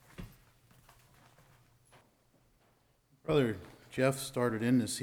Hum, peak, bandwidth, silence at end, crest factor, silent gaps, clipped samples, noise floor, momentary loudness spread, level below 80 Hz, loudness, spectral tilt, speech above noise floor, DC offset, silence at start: none; -18 dBFS; 17.5 kHz; 0 s; 20 dB; none; under 0.1%; -70 dBFS; 21 LU; -62 dBFS; -33 LUFS; -5.5 dB/octave; 39 dB; under 0.1%; 0.2 s